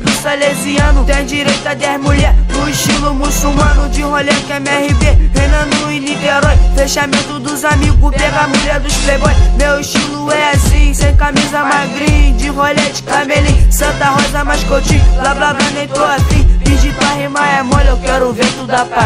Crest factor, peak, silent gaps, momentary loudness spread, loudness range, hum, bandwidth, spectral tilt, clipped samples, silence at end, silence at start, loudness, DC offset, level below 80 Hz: 10 dB; 0 dBFS; none; 3 LU; 1 LU; none; 15.5 kHz; -4.5 dB/octave; 0.3%; 0 s; 0 s; -12 LUFS; under 0.1%; -14 dBFS